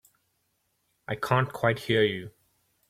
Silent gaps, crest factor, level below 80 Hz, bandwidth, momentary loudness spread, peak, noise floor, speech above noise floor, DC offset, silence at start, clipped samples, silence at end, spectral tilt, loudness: none; 22 dB; -64 dBFS; 15.5 kHz; 18 LU; -8 dBFS; -75 dBFS; 48 dB; under 0.1%; 1.1 s; under 0.1%; 0.6 s; -6 dB/octave; -27 LUFS